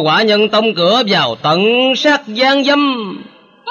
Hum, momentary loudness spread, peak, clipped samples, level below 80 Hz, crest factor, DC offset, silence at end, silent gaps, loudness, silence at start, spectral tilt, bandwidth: none; 10 LU; -2 dBFS; under 0.1%; -68 dBFS; 12 dB; under 0.1%; 0 s; none; -12 LUFS; 0 s; -4.5 dB/octave; 12 kHz